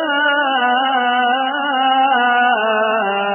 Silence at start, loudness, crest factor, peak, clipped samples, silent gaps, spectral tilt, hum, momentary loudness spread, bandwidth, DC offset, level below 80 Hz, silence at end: 0 s; -15 LUFS; 12 dB; -4 dBFS; under 0.1%; none; -8 dB/octave; none; 3 LU; 3.3 kHz; under 0.1%; -86 dBFS; 0 s